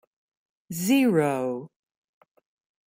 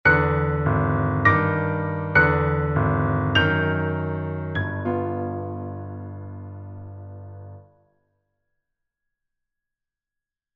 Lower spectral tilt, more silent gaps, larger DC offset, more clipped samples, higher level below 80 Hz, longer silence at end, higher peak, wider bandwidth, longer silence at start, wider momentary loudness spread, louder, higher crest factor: second, -5.5 dB/octave vs -8.5 dB/octave; neither; neither; neither; second, -72 dBFS vs -42 dBFS; second, 1.2 s vs 2.95 s; second, -10 dBFS vs -4 dBFS; first, 16 kHz vs 6 kHz; first, 0.7 s vs 0.05 s; second, 16 LU vs 20 LU; about the same, -24 LUFS vs -22 LUFS; about the same, 16 dB vs 20 dB